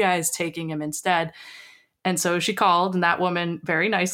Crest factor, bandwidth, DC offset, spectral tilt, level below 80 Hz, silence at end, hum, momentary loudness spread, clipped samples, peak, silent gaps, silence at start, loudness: 18 dB; 17 kHz; under 0.1%; -3.5 dB/octave; -68 dBFS; 0 s; none; 10 LU; under 0.1%; -6 dBFS; none; 0 s; -23 LUFS